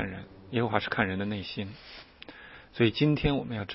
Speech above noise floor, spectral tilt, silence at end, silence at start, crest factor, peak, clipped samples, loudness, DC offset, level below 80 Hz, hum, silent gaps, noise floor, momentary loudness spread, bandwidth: 20 dB; -10 dB/octave; 0 s; 0 s; 24 dB; -8 dBFS; under 0.1%; -29 LUFS; under 0.1%; -48 dBFS; none; none; -49 dBFS; 21 LU; 5.8 kHz